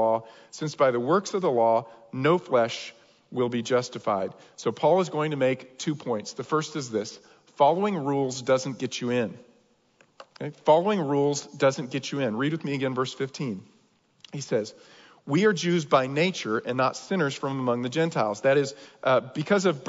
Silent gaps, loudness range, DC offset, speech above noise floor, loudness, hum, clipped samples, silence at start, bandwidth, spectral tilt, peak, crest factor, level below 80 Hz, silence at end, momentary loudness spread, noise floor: none; 3 LU; under 0.1%; 38 dB; -26 LUFS; none; under 0.1%; 0 s; 7.8 kHz; -5.5 dB/octave; -8 dBFS; 18 dB; -76 dBFS; 0 s; 11 LU; -64 dBFS